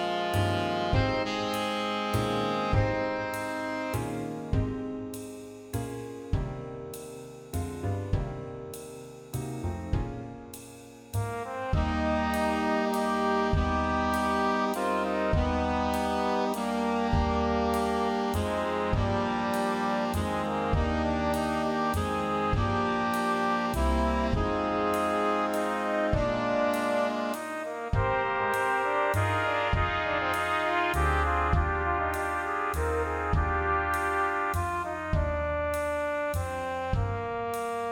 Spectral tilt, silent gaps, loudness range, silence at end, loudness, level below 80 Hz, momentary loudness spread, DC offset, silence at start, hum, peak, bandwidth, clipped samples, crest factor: -6 dB/octave; none; 8 LU; 0 s; -29 LUFS; -38 dBFS; 10 LU; under 0.1%; 0 s; none; -12 dBFS; 17 kHz; under 0.1%; 16 dB